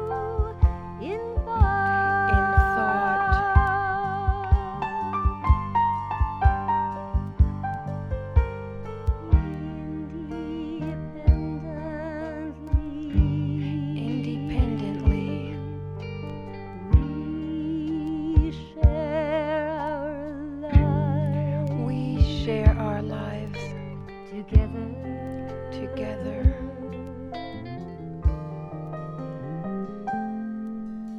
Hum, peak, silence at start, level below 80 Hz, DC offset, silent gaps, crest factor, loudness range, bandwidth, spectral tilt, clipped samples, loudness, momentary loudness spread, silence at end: none; -4 dBFS; 0 s; -28 dBFS; under 0.1%; none; 20 dB; 8 LU; 6 kHz; -9 dB/octave; under 0.1%; -26 LUFS; 13 LU; 0 s